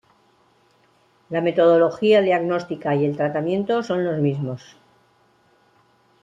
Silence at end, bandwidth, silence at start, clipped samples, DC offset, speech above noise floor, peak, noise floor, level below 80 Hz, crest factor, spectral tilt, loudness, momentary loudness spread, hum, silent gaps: 1.65 s; 7.8 kHz; 1.3 s; under 0.1%; under 0.1%; 40 dB; -6 dBFS; -60 dBFS; -66 dBFS; 16 dB; -7.5 dB/octave; -20 LUFS; 10 LU; none; none